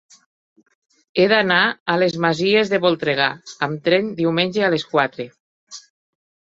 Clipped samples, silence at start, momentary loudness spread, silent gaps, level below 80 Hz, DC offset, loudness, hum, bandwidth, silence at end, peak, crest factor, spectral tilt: under 0.1%; 1.15 s; 18 LU; 1.80-1.86 s, 5.40-5.67 s; -62 dBFS; under 0.1%; -18 LUFS; none; 7.8 kHz; 0.75 s; 0 dBFS; 20 dB; -5 dB/octave